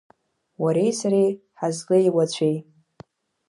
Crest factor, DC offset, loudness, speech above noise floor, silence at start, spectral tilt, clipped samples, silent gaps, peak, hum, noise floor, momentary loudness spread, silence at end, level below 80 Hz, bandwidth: 16 dB; under 0.1%; -22 LUFS; 29 dB; 0.6 s; -6 dB/octave; under 0.1%; none; -8 dBFS; none; -50 dBFS; 9 LU; 0.85 s; -72 dBFS; 11.5 kHz